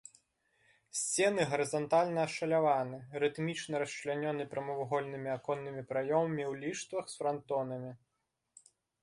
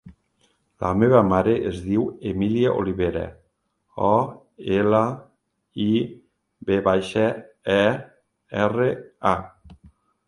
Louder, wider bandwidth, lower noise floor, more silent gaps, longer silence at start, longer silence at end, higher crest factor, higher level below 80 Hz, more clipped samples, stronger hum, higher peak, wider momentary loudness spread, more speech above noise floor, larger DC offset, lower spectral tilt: second, -34 LUFS vs -22 LUFS; about the same, 11.5 kHz vs 11.5 kHz; first, -76 dBFS vs -70 dBFS; neither; first, 0.95 s vs 0.05 s; first, 1.05 s vs 0.4 s; about the same, 18 dB vs 20 dB; second, -76 dBFS vs -48 dBFS; neither; neither; second, -16 dBFS vs -2 dBFS; second, 9 LU vs 13 LU; second, 42 dB vs 50 dB; neither; second, -4.5 dB/octave vs -7.5 dB/octave